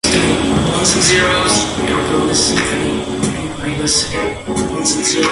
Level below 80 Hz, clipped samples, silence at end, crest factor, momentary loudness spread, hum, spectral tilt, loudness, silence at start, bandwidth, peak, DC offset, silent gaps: -32 dBFS; under 0.1%; 0 s; 16 dB; 9 LU; none; -3 dB/octave; -14 LUFS; 0.05 s; 11.5 kHz; 0 dBFS; under 0.1%; none